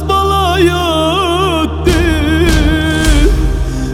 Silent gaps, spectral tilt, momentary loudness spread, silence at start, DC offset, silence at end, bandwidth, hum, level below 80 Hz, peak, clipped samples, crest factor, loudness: none; -5.5 dB/octave; 3 LU; 0 s; under 0.1%; 0 s; 16 kHz; none; -16 dBFS; 0 dBFS; under 0.1%; 10 dB; -12 LUFS